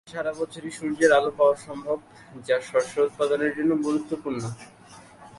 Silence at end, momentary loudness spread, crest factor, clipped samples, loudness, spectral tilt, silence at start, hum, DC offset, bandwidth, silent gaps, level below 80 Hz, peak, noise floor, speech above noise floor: 0 s; 13 LU; 20 dB; under 0.1%; -25 LUFS; -5 dB/octave; 0.05 s; none; under 0.1%; 11.5 kHz; none; -66 dBFS; -6 dBFS; -48 dBFS; 23 dB